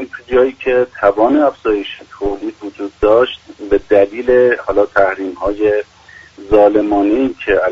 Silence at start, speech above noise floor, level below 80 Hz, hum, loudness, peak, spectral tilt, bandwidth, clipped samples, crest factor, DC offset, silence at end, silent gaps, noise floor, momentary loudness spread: 0 s; 26 dB; -38 dBFS; none; -14 LUFS; 0 dBFS; -6.5 dB/octave; 7.4 kHz; under 0.1%; 14 dB; under 0.1%; 0 s; none; -39 dBFS; 11 LU